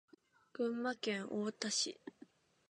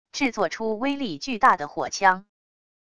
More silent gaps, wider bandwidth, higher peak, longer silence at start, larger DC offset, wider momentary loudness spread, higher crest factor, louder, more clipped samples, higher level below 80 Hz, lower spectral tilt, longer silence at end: neither; about the same, 11 kHz vs 11 kHz; second, -22 dBFS vs -4 dBFS; first, 0.55 s vs 0.05 s; second, under 0.1% vs 0.4%; first, 18 LU vs 9 LU; about the same, 20 dB vs 20 dB; second, -39 LUFS vs -24 LUFS; neither; second, under -90 dBFS vs -60 dBFS; about the same, -2.5 dB/octave vs -3.5 dB/octave; about the same, 0.6 s vs 0.7 s